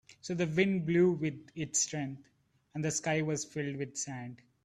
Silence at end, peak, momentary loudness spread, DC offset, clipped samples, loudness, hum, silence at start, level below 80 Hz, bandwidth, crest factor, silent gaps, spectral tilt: 0.3 s; -14 dBFS; 14 LU; under 0.1%; under 0.1%; -33 LUFS; none; 0.1 s; -70 dBFS; 12 kHz; 18 dB; none; -4.5 dB/octave